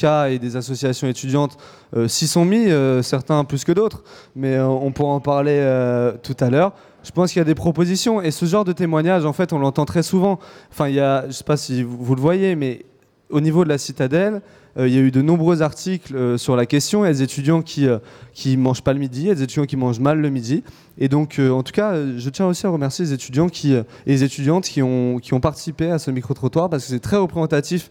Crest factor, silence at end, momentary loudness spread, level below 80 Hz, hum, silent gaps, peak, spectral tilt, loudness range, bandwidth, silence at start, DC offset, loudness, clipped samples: 16 dB; 0.05 s; 7 LU; -50 dBFS; none; none; -2 dBFS; -6.5 dB/octave; 2 LU; 17 kHz; 0 s; under 0.1%; -19 LUFS; under 0.1%